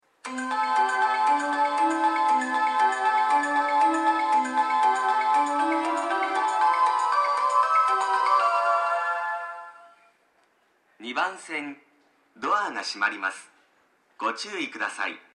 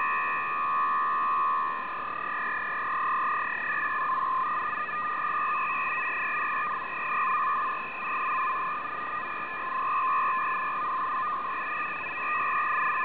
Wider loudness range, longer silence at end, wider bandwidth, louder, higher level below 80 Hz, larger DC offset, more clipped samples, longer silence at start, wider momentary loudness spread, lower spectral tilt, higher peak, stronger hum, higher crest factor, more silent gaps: first, 8 LU vs 1 LU; first, 0.15 s vs 0 s; first, 11 kHz vs 4 kHz; first, -24 LUFS vs -28 LUFS; second, -82 dBFS vs -68 dBFS; second, under 0.1% vs 0.4%; neither; first, 0.25 s vs 0 s; first, 10 LU vs 5 LU; about the same, -1.5 dB/octave vs -0.5 dB/octave; first, -10 dBFS vs -18 dBFS; neither; about the same, 14 dB vs 10 dB; neither